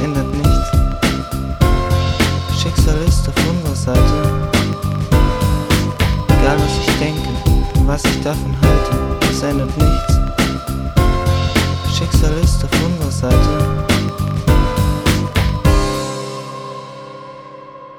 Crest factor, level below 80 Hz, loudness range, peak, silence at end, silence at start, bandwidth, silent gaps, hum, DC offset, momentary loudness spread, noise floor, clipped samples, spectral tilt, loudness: 14 dB; -20 dBFS; 1 LU; 0 dBFS; 0 s; 0 s; 19.5 kHz; none; 50 Hz at -35 dBFS; under 0.1%; 8 LU; -35 dBFS; under 0.1%; -5.5 dB/octave; -16 LUFS